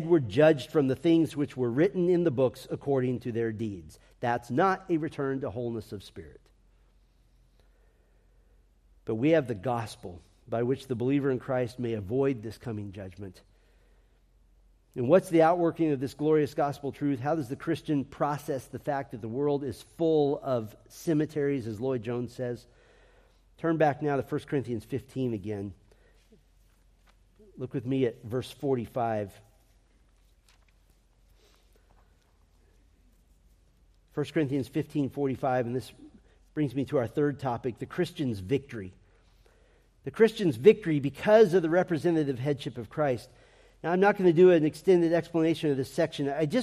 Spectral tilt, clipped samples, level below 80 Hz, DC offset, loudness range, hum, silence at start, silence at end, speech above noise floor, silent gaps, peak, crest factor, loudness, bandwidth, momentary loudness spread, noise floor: -7.5 dB/octave; under 0.1%; -62 dBFS; under 0.1%; 11 LU; none; 0 s; 0 s; 36 dB; none; -6 dBFS; 22 dB; -28 LUFS; 14.5 kHz; 15 LU; -63 dBFS